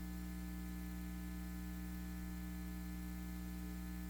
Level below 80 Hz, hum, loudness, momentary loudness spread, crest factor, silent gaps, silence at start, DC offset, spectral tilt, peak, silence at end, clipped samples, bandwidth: -50 dBFS; 60 Hz at -45 dBFS; -47 LUFS; 0 LU; 10 dB; none; 0 s; under 0.1%; -6 dB/octave; -36 dBFS; 0 s; under 0.1%; 17.5 kHz